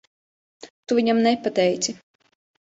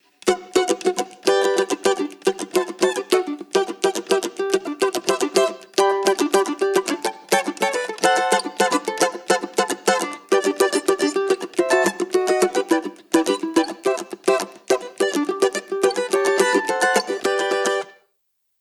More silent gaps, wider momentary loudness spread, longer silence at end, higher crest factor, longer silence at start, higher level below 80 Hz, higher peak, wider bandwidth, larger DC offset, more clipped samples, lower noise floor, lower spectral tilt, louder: first, 0.70-0.83 s vs none; first, 17 LU vs 5 LU; first, 0.85 s vs 0.7 s; about the same, 18 dB vs 20 dB; first, 0.65 s vs 0.25 s; about the same, -68 dBFS vs -68 dBFS; second, -8 dBFS vs 0 dBFS; second, 8 kHz vs 14.5 kHz; neither; neither; first, under -90 dBFS vs -70 dBFS; first, -4 dB/octave vs -2.5 dB/octave; about the same, -21 LUFS vs -21 LUFS